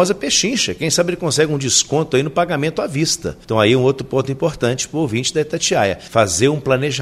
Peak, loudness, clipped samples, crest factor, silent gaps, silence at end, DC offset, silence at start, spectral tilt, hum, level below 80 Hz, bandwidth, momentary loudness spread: 0 dBFS; -17 LUFS; under 0.1%; 16 dB; none; 0 s; under 0.1%; 0 s; -3.5 dB/octave; none; -46 dBFS; 15.5 kHz; 6 LU